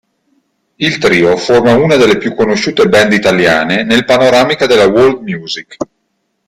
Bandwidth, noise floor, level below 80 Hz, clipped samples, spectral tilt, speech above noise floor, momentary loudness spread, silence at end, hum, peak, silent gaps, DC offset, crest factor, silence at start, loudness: 15.5 kHz; -65 dBFS; -44 dBFS; under 0.1%; -5 dB/octave; 56 dB; 12 LU; 0.65 s; none; 0 dBFS; none; under 0.1%; 10 dB; 0.8 s; -9 LUFS